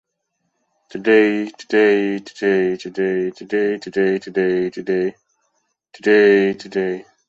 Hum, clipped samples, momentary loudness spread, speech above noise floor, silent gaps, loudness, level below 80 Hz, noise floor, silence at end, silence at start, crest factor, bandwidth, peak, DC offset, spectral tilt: none; under 0.1%; 10 LU; 56 dB; none; -18 LUFS; -64 dBFS; -73 dBFS; 0.25 s; 0.95 s; 16 dB; 7.8 kHz; -2 dBFS; under 0.1%; -6.5 dB/octave